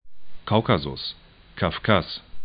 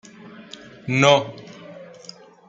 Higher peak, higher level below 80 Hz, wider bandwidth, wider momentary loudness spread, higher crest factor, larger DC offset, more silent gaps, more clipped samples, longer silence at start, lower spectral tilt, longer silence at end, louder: about the same, -2 dBFS vs -2 dBFS; first, -46 dBFS vs -66 dBFS; second, 5.2 kHz vs 9 kHz; second, 19 LU vs 25 LU; about the same, 22 dB vs 22 dB; neither; neither; neither; second, 0.05 s vs 0.85 s; first, -10.5 dB/octave vs -4.5 dB/octave; second, 0 s vs 0.65 s; second, -24 LUFS vs -18 LUFS